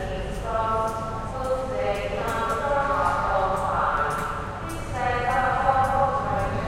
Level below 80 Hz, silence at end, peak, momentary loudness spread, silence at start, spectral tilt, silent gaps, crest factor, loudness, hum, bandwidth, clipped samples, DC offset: -36 dBFS; 0 s; -8 dBFS; 9 LU; 0 s; -5.5 dB/octave; none; 18 dB; -25 LUFS; none; 16 kHz; under 0.1%; under 0.1%